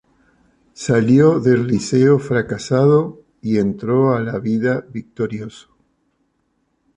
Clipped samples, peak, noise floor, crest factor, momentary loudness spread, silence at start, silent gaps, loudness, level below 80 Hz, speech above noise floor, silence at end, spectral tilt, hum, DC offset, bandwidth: under 0.1%; -2 dBFS; -67 dBFS; 16 dB; 15 LU; 0.8 s; none; -17 LUFS; -52 dBFS; 50 dB; 1.4 s; -7.5 dB/octave; none; under 0.1%; 10.5 kHz